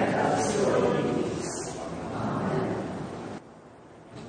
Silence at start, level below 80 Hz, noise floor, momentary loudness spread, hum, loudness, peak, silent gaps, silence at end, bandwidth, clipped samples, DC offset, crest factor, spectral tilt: 0 s; -56 dBFS; -49 dBFS; 15 LU; none; -29 LUFS; -12 dBFS; none; 0 s; 9.6 kHz; under 0.1%; under 0.1%; 16 dB; -5.5 dB/octave